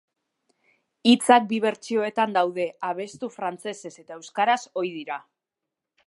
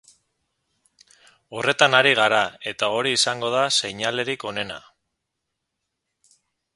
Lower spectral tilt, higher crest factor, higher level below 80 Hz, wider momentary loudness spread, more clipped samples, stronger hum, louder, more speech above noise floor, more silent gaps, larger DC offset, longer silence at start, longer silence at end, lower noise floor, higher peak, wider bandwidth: first, -4 dB/octave vs -2 dB/octave; about the same, 22 dB vs 24 dB; second, -80 dBFS vs -66 dBFS; about the same, 16 LU vs 14 LU; neither; neither; second, -24 LUFS vs -20 LUFS; about the same, 62 dB vs 59 dB; neither; neither; second, 1.05 s vs 1.5 s; second, 0.9 s vs 1.95 s; first, -86 dBFS vs -80 dBFS; about the same, -2 dBFS vs 0 dBFS; about the same, 11.5 kHz vs 11.5 kHz